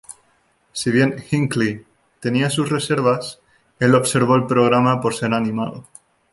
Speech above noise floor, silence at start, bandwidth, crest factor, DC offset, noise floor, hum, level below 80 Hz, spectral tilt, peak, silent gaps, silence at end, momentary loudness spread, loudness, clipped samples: 43 dB; 0.1 s; 11.5 kHz; 18 dB; under 0.1%; -61 dBFS; none; -56 dBFS; -5.5 dB/octave; -2 dBFS; none; 0.5 s; 13 LU; -19 LUFS; under 0.1%